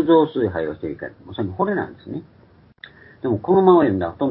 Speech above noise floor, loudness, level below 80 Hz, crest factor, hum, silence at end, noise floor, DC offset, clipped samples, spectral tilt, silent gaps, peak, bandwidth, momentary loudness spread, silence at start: 27 dB; -20 LUFS; -48 dBFS; 18 dB; none; 0 s; -46 dBFS; under 0.1%; under 0.1%; -12 dB/octave; none; -2 dBFS; 4.3 kHz; 19 LU; 0 s